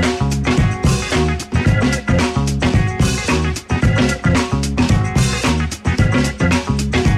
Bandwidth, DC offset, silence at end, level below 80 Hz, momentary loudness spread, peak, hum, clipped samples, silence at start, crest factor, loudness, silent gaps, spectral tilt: 14.5 kHz; under 0.1%; 0 s; -26 dBFS; 3 LU; -2 dBFS; none; under 0.1%; 0 s; 14 dB; -16 LUFS; none; -5.5 dB/octave